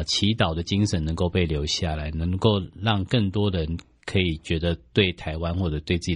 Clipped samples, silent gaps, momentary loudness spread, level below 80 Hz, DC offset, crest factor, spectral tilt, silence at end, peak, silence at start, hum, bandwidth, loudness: under 0.1%; none; 6 LU; -38 dBFS; under 0.1%; 18 dB; -5.5 dB/octave; 0 s; -6 dBFS; 0 s; none; 10.5 kHz; -25 LUFS